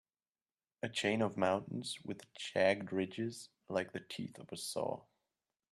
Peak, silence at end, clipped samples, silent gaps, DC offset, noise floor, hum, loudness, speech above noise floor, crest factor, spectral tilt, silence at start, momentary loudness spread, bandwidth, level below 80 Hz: -18 dBFS; 0.7 s; under 0.1%; none; under 0.1%; under -90 dBFS; none; -38 LUFS; over 52 dB; 22 dB; -4.5 dB/octave; 0.85 s; 13 LU; 13.5 kHz; -80 dBFS